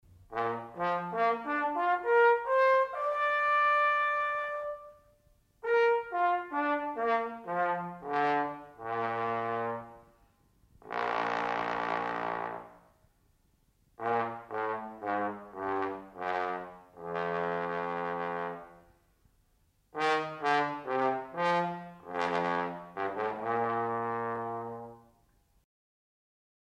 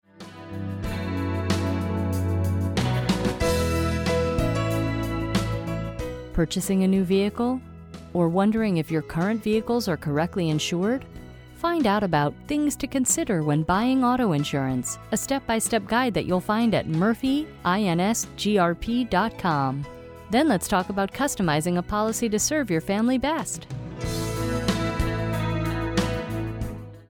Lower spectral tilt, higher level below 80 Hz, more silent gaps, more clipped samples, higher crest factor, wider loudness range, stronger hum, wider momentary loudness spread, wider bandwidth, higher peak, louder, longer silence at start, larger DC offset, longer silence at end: about the same, -6 dB/octave vs -5 dB/octave; second, -70 dBFS vs -40 dBFS; neither; neither; about the same, 16 dB vs 16 dB; first, 9 LU vs 2 LU; neither; first, 13 LU vs 9 LU; second, 9.8 kHz vs over 20 kHz; second, -16 dBFS vs -8 dBFS; second, -31 LUFS vs -25 LUFS; about the same, 0.2 s vs 0.2 s; neither; first, 1.65 s vs 0.05 s